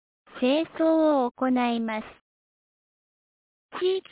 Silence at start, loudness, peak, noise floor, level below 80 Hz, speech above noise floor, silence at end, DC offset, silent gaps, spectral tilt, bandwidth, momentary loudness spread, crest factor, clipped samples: 0.35 s; -25 LUFS; -14 dBFS; under -90 dBFS; -68 dBFS; over 66 dB; 0.1 s; under 0.1%; 1.31-1.35 s, 2.21-3.69 s; -8.5 dB/octave; 4 kHz; 9 LU; 14 dB; under 0.1%